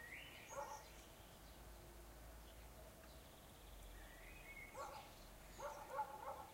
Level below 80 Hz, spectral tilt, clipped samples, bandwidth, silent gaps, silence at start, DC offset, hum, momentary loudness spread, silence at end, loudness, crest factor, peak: -64 dBFS; -3.5 dB/octave; under 0.1%; 16 kHz; none; 0 s; under 0.1%; none; 11 LU; 0 s; -56 LUFS; 20 dB; -34 dBFS